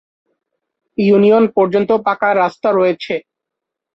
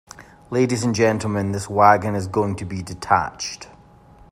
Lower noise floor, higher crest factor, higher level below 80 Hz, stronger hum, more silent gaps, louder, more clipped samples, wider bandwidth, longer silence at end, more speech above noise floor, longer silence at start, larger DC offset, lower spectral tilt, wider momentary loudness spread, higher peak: first, -81 dBFS vs -48 dBFS; second, 14 dB vs 20 dB; second, -60 dBFS vs -52 dBFS; neither; neither; first, -14 LUFS vs -20 LUFS; neither; second, 6 kHz vs 15 kHz; about the same, 0.75 s vs 0.65 s; first, 68 dB vs 28 dB; first, 1 s vs 0.2 s; neither; first, -8 dB/octave vs -5.5 dB/octave; second, 12 LU vs 15 LU; about the same, -2 dBFS vs -2 dBFS